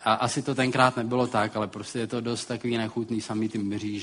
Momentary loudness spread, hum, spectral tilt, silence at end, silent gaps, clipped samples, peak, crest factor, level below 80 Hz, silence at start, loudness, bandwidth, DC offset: 8 LU; none; -5 dB/octave; 0 s; none; under 0.1%; -6 dBFS; 20 dB; -64 dBFS; 0 s; -27 LUFS; 10.5 kHz; under 0.1%